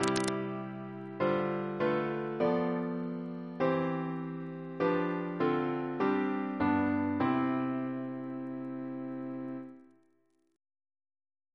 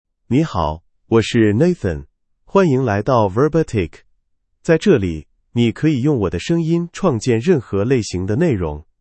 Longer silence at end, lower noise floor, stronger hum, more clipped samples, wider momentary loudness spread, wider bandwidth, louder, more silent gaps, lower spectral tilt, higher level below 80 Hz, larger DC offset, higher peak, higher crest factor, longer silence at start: first, 1.7 s vs 0.2 s; first, -73 dBFS vs -64 dBFS; neither; neither; about the same, 10 LU vs 10 LU; first, 11 kHz vs 8.8 kHz; second, -33 LUFS vs -17 LUFS; neither; about the same, -6.5 dB/octave vs -7 dB/octave; second, -70 dBFS vs -42 dBFS; neither; second, -10 dBFS vs 0 dBFS; first, 24 dB vs 18 dB; second, 0 s vs 0.3 s